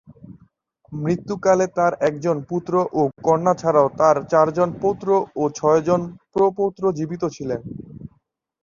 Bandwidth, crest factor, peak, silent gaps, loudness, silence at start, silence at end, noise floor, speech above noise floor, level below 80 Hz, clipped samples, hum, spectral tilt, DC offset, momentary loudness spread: 7.4 kHz; 18 dB; -2 dBFS; none; -20 LUFS; 0.1 s; 0.55 s; -64 dBFS; 44 dB; -56 dBFS; under 0.1%; none; -7 dB/octave; under 0.1%; 11 LU